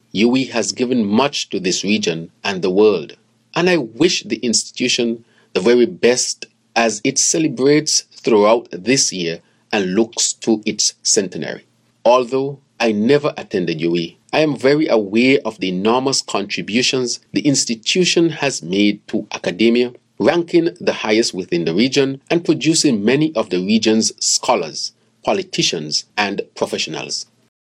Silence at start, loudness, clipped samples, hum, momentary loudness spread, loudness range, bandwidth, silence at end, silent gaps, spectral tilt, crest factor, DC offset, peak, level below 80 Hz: 0.15 s; -17 LUFS; under 0.1%; none; 9 LU; 2 LU; 14 kHz; 0.5 s; none; -3.5 dB/octave; 16 dB; under 0.1%; 0 dBFS; -64 dBFS